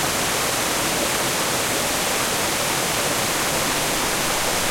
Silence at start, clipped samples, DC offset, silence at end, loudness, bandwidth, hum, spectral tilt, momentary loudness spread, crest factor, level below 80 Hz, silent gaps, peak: 0 s; under 0.1%; under 0.1%; 0 s; -20 LUFS; 16.5 kHz; none; -1.5 dB/octave; 0 LU; 14 dB; -44 dBFS; none; -8 dBFS